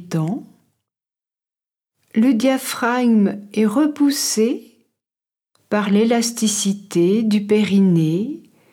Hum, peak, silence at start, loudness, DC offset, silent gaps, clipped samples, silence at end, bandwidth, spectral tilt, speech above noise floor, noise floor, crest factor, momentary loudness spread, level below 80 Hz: none; -6 dBFS; 0 s; -18 LUFS; under 0.1%; none; under 0.1%; 0.35 s; 17 kHz; -5 dB/octave; over 73 dB; under -90 dBFS; 14 dB; 8 LU; -76 dBFS